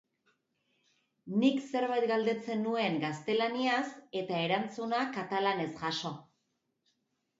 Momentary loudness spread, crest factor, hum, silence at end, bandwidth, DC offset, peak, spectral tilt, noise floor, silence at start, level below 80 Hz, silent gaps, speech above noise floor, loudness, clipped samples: 6 LU; 20 dB; none; 1.2 s; 8 kHz; under 0.1%; -14 dBFS; -5.5 dB/octave; -81 dBFS; 1.25 s; -80 dBFS; none; 49 dB; -32 LUFS; under 0.1%